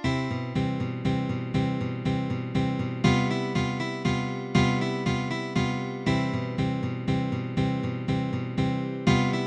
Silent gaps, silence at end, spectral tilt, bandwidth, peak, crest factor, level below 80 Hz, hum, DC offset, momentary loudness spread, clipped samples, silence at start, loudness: none; 0 s; -6.5 dB/octave; 9.4 kHz; -8 dBFS; 18 dB; -46 dBFS; none; under 0.1%; 5 LU; under 0.1%; 0 s; -27 LUFS